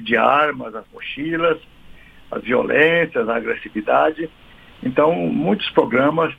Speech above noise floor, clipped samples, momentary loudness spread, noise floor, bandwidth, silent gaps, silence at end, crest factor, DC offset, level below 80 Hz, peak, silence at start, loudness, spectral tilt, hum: 24 dB; under 0.1%; 16 LU; -42 dBFS; 5 kHz; none; 0.05 s; 20 dB; under 0.1%; -52 dBFS; 0 dBFS; 0 s; -18 LUFS; -7.5 dB/octave; none